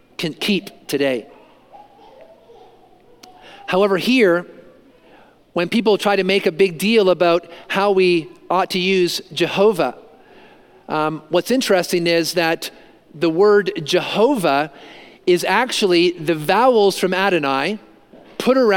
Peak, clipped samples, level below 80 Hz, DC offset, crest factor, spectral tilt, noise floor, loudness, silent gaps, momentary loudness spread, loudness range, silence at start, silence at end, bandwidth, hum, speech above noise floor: -2 dBFS; under 0.1%; -62 dBFS; under 0.1%; 16 dB; -4.5 dB/octave; -49 dBFS; -17 LUFS; none; 9 LU; 4 LU; 0.2 s; 0 s; 17 kHz; none; 32 dB